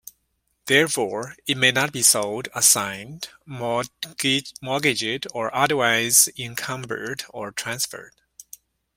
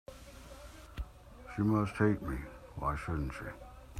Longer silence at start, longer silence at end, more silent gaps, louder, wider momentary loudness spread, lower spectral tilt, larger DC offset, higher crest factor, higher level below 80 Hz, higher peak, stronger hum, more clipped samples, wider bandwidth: first, 0.65 s vs 0.1 s; first, 0.9 s vs 0 s; neither; first, -21 LUFS vs -35 LUFS; second, 15 LU vs 20 LU; second, -1.5 dB/octave vs -7.5 dB/octave; neither; about the same, 24 dB vs 22 dB; second, -62 dBFS vs -48 dBFS; first, 0 dBFS vs -14 dBFS; neither; neither; first, 16.5 kHz vs 14.5 kHz